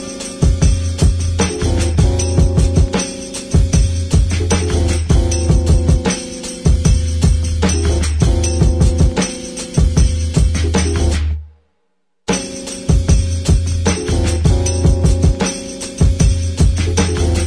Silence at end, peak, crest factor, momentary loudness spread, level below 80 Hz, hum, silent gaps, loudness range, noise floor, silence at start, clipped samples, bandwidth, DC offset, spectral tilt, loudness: 0 s; -2 dBFS; 12 dB; 6 LU; -18 dBFS; none; none; 3 LU; -70 dBFS; 0 s; under 0.1%; 10.5 kHz; under 0.1%; -5.5 dB/octave; -16 LUFS